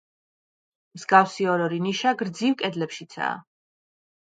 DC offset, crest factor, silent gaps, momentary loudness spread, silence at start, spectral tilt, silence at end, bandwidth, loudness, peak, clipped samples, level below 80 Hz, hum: under 0.1%; 24 dB; none; 13 LU; 0.95 s; -5 dB/octave; 0.8 s; 9.2 kHz; -24 LUFS; -2 dBFS; under 0.1%; -76 dBFS; none